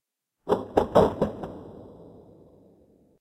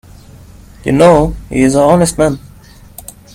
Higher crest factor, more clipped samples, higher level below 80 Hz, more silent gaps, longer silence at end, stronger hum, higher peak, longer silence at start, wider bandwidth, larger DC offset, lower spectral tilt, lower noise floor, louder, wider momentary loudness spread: first, 24 dB vs 12 dB; second, under 0.1% vs 0.1%; second, -50 dBFS vs -30 dBFS; neither; first, 1.15 s vs 0.95 s; neither; second, -4 dBFS vs 0 dBFS; second, 0.45 s vs 0.85 s; about the same, 15.5 kHz vs 16.5 kHz; neither; first, -7.5 dB/octave vs -6 dB/octave; first, -59 dBFS vs -38 dBFS; second, -24 LUFS vs -11 LUFS; about the same, 24 LU vs 23 LU